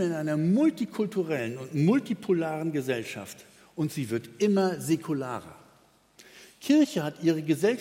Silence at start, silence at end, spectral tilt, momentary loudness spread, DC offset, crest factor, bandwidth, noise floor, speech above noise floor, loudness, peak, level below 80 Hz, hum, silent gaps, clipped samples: 0 s; 0 s; -6.5 dB/octave; 13 LU; under 0.1%; 18 dB; 16.5 kHz; -61 dBFS; 34 dB; -27 LUFS; -10 dBFS; -72 dBFS; none; none; under 0.1%